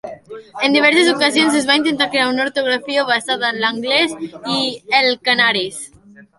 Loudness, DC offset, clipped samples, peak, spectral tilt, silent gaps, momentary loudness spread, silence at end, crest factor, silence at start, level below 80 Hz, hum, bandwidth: -15 LUFS; under 0.1%; under 0.1%; 0 dBFS; -2.5 dB/octave; none; 13 LU; 0.2 s; 16 dB; 0.05 s; -62 dBFS; none; 11.5 kHz